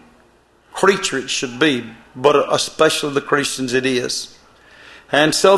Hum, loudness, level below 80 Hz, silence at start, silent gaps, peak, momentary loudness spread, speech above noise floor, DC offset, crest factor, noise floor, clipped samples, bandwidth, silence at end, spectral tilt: none; -17 LUFS; -56 dBFS; 0.75 s; none; 0 dBFS; 9 LU; 37 dB; under 0.1%; 18 dB; -53 dBFS; under 0.1%; 13 kHz; 0 s; -3 dB/octave